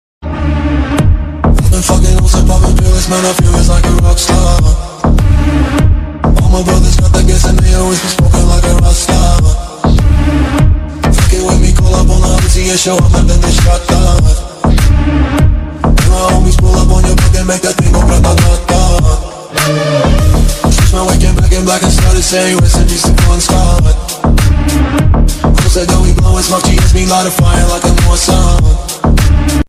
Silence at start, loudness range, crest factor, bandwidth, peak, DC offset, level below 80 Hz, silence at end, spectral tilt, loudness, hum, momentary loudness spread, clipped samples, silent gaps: 0.2 s; 1 LU; 8 dB; 15 kHz; 0 dBFS; under 0.1%; -10 dBFS; 0.05 s; -5 dB/octave; -10 LUFS; none; 4 LU; 2%; none